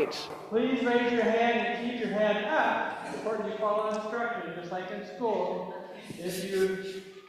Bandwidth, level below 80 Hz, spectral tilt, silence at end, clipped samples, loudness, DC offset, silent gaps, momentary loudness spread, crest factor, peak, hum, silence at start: 14.5 kHz; -70 dBFS; -5 dB/octave; 0 s; under 0.1%; -30 LUFS; under 0.1%; none; 11 LU; 16 dB; -12 dBFS; none; 0 s